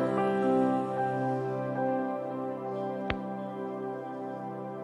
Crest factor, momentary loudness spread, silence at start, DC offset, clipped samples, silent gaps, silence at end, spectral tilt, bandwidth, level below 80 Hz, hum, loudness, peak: 20 dB; 11 LU; 0 s; under 0.1%; under 0.1%; none; 0 s; -8 dB/octave; 10.5 kHz; -58 dBFS; none; -32 LUFS; -10 dBFS